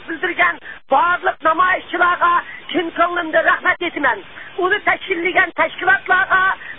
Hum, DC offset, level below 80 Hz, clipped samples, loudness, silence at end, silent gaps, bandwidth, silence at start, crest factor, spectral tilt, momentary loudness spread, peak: none; 0.7%; -54 dBFS; under 0.1%; -16 LUFS; 0 s; none; 4 kHz; 0 s; 14 dB; -8.5 dB/octave; 7 LU; -2 dBFS